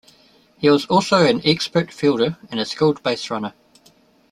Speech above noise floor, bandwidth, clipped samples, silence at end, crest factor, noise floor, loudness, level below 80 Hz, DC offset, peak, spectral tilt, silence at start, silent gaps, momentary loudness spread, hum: 36 dB; 13 kHz; under 0.1%; 0.8 s; 18 dB; -55 dBFS; -19 LUFS; -60 dBFS; under 0.1%; -2 dBFS; -5.5 dB/octave; 0.6 s; none; 11 LU; none